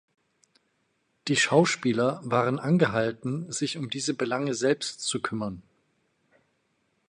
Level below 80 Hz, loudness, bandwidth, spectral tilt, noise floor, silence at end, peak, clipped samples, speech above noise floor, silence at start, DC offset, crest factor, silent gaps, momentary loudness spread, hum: -66 dBFS; -26 LUFS; 11.5 kHz; -4.5 dB/octave; -73 dBFS; 1.5 s; -8 dBFS; under 0.1%; 47 dB; 1.25 s; under 0.1%; 22 dB; none; 10 LU; none